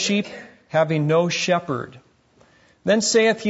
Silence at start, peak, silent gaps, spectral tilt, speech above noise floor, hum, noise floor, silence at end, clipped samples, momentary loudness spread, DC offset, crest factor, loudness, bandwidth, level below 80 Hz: 0 s; -6 dBFS; none; -4 dB/octave; 36 dB; none; -56 dBFS; 0 s; under 0.1%; 15 LU; under 0.1%; 16 dB; -21 LUFS; 8 kHz; -66 dBFS